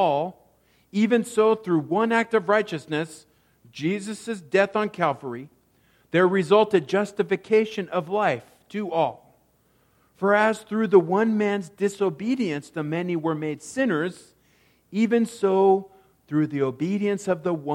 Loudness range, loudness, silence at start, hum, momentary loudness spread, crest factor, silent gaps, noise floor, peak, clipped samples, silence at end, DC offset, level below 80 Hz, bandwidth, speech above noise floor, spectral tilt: 4 LU; -24 LUFS; 0 s; none; 11 LU; 20 dB; none; -64 dBFS; -4 dBFS; under 0.1%; 0 s; under 0.1%; -70 dBFS; 12.5 kHz; 41 dB; -6 dB/octave